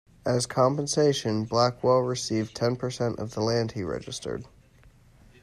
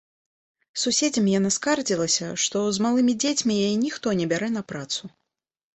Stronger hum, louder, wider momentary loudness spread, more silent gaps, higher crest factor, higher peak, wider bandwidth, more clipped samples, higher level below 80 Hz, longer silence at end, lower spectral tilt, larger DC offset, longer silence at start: neither; second, -26 LUFS vs -23 LUFS; about the same, 10 LU vs 9 LU; neither; about the same, 18 dB vs 16 dB; about the same, -8 dBFS vs -8 dBFS; first, 14 kHz vs 8.4 kHz; neither; first, -58 dBFS vs -64 dBFS; first, 0.95 s vs 0.65 s; first, -5 dB/octave vs -3.5 dB/octave; neither; second, 0.25 s vs 0.75 s